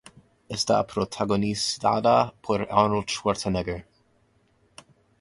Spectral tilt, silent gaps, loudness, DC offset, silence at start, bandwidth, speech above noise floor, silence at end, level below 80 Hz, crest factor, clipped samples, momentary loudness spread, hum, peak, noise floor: -4.5 dB/octave; none; -25 LUFS; under 0.1%; 0.5 s; 11.5 kHz; 40 dB; 1.4 s; -52 dBFS; 22 dB; under 0.1%; 8 LU; none; -4 dBFS; -65 dBFS